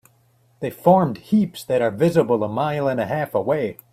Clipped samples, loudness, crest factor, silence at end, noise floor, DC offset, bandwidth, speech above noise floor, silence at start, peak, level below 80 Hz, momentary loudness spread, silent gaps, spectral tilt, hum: under 0.1%; -20 LUFS; 18 dB; 0.2 s; -59 dBFS; under 0.1%; 15.5 kHz; 39 dB; 0.6 s; -2 dBFS; -60 dBFS; 7 LU; none; -7.5 dB/octave; none